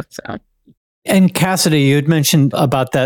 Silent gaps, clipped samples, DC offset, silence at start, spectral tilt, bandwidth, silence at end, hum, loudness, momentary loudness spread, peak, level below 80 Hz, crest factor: 0.77-1.02 s; under 0.1%; under 0.1%; 0 s; -5 dB/octave; 18 kHz; 0 s; none; -13 LUFS; 17 LU; -4 dBFS; -52 dBFS; 12 dB